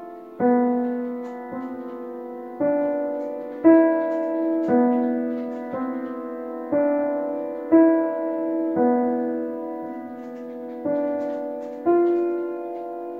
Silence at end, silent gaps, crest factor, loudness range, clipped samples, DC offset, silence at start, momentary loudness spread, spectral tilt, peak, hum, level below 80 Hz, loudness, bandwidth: 0 s; none; 18 dB; 4 LU; under 0.1%; under 0.1%; 0 s; 16 LU; -9.5 dB/octave; -6 dBFS; none; -72 dBFS; -23 LUFS; 3.1 kHz